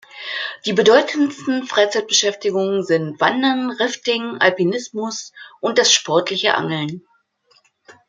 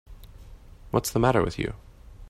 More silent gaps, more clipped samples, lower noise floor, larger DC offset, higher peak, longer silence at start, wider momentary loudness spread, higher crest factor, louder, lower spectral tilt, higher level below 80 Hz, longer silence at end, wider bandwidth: neither; neither; first, -59 dBFS vs -46 dBFS; neither; first, 0 dBFS vs -8 dBFS; about the same, 0.15 s vs 0.1 s; about the same, 12 LU vs 11 LU; about the same, 18 dB vs 20 dB; first, -18 LUFS vs -26 LUFS; second, -3 dB/octave vs -5.5 dB/octave; second, -70 dBFS vs -44 dBFS; first, 0.15 s vs 0 s; second, 9.6 kHz vs 16 kHz